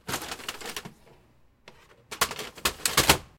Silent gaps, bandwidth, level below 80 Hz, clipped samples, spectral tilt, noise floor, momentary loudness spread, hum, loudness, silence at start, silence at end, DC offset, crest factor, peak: none; 17 kHz; -48 dBFS; under 0.1%; -1.5 dB/octave; -60 dBFS; 18 LU; none; -27 LUFS; 0.05 s; 0.15 s; under 0.1%; 28 dB; -2 dBFS